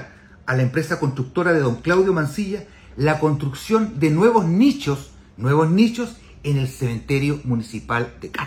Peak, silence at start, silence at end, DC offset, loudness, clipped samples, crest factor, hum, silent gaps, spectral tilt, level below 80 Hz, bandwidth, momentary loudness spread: -4 dBFS; 0 s; 0 s; under 0.1%; -20 LUFS; under 0.1%; 16 dB; none; none; -7 dB/octave; -46 dBFS; 16 kHz; 12 LU